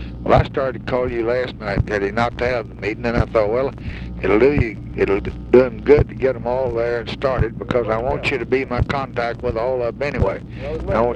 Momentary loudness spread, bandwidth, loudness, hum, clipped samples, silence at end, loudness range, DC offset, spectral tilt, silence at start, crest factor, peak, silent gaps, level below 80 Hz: 8 LU; 8.8 kHz; -20 LUFS; none; under 0.1%; 0 s; 3 LU; under 0.1%; -8 dB/octave; 0 s; 18 dB; 0 dBFS; none; -32 dBFS